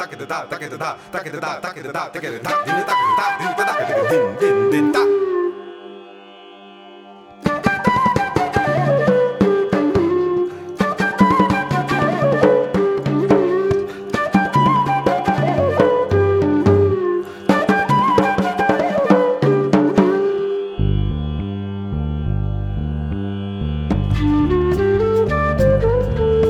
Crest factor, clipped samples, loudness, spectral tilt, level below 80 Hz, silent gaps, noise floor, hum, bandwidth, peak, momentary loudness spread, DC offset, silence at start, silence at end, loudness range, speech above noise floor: 16 dB; under 0.1%; -18 LUFS; -7 dB/octave; -32 dBFS; none; -40 dBFS; none; 14.5 kHz; 0 dBFS; 10 LU; under 0.1%; 0 s; 0 s; 6 LU; 21 dB